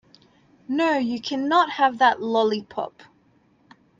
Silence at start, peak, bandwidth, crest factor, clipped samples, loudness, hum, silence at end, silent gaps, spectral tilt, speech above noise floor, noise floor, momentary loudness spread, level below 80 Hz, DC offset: 0.7 s; -6 dBFS; 7.8 kHz; 18 dB; under 0.1%; -22 LUFS; none; 1.1 s; none; -4.5 dB/octave; 39 dB; -60 dBFS; 12 LU; -70 dBFS; under 0.1%